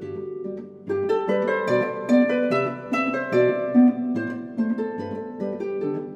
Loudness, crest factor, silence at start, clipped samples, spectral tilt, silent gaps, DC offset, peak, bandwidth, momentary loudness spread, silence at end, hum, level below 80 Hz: -23 LUFS; 16 dB; 0 s; under 0.1%; -7.5 dB/octave; none; under 0.1%; -6 dBFS; 7.8 kHz; 13 LU; 0 s; none; -72 dBFS